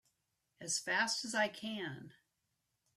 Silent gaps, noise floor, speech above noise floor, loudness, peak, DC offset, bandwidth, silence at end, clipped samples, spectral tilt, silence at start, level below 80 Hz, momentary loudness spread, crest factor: none; -85 dBFS; 46 dB; -36 LUFS; -22 dBFS; under 0.1%; 14.5 kHz; 0.85 s; under 0.1%; -1.5 dB/octave; 0.6 s; -84 dBFS; 14 LU; 20 dB